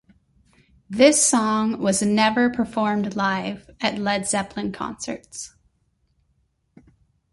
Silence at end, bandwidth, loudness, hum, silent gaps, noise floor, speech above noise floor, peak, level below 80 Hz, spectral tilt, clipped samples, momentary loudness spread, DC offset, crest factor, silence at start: 1.85 s; 12 kHz; -21 LUFS; none; none; -68 dBFS; 46 dB; -2 dBFS; -56 dBFS; -3.5 dB/octave; under 0.1%; 16 LU; under 0.1%; 22 dB; 0.9 s